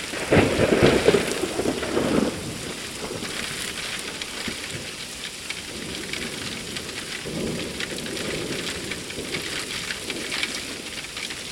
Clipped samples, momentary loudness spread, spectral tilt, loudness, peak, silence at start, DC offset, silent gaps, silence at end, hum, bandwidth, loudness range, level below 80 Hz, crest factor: under 0.1%; 11 LU; -3.5 dB/octave; -26 LUFS; -2 dBFS; 0 s; under 0.1%; none; 0 s; none; 16.5 kHz; 7 LU; -46 dBFS; 24 dB